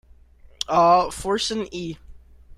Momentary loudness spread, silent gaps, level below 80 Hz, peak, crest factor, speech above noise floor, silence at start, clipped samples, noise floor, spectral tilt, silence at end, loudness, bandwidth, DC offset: 17 LU; none; -48 dBFS; -6 dBFS; 18 dB; 29 dB; 0.7 s; under 0.1%; -50 dBFS; -4 dB/octave; 0.05 s; -21 LUFS; 15 kHz; under 0.1%